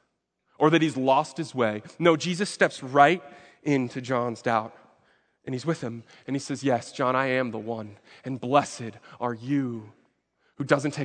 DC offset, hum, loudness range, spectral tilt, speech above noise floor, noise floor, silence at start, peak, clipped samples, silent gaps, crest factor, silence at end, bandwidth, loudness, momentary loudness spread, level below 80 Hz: under 0.1%; none; 7 LU; -5.5 dB/octave; 49 dB; -75 dBFS; 0.6 s; -2 dBFS; under 0.1%; none; 24 dB; 0 s; 9.4 kHz; -26 LUFS; 15 LU; -74 dBFS